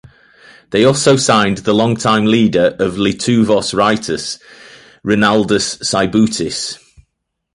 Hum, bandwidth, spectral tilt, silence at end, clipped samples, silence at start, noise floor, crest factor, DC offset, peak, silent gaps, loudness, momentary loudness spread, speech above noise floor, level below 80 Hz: none; 11.5 kHz; -4.5 dB/octave; 0.8 s; under 0.1%; 0.7 s; -73 dBFS; 14 dB; under 0.1%; 0 dBFS; none; -14 LUFS; 10 LU; 59 dB; -46 dBFS